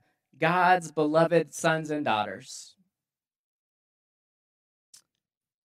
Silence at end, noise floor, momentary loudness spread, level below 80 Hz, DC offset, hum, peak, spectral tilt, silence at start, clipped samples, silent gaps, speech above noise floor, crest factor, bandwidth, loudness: 3.15 s; under -90 dBFS; 15 LU; -82 dBFS; under 0.1%; none; -8 dBFS; -5 dB/octave; 0.4 s; under 0.1%; none; over 64 dB; 20 dB; 15 kHz; -25 LUFS